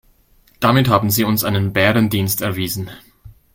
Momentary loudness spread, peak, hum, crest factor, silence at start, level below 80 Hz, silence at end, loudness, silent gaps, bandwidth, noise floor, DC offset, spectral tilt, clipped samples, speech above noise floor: 9 LU; 0 dBFS; none; 18 dB; 0.6 s; -46 dBFS; 0.25 s; -17 LUFS; none; 17 kHz; -54 dBFS; under 0.1%; -5 dB/octave; under 0.1%; 37 dB